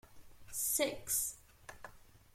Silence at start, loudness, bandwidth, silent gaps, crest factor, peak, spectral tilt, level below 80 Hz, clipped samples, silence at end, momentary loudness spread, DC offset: 0.05 s; -35 LUFS; 16.5 kHz; none; 22 dB; -20 dBFS; -1 dB/octave; -64 dBFS; under 0.1%; 0.15 s; 22 LU; under 0.1%